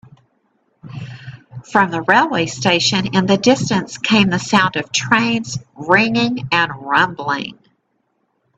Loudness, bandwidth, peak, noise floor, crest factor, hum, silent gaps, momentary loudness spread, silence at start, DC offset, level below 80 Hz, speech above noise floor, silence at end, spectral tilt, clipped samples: -16 LUFS; 9 kHz; 0 dBFS; -67 dBFS; 18 dB; none; none; 18 LU; 0.85 s; under 0.1%; -54 dBFS; 51 dB; 1.05 s; -4 dB/octave; under 0.1%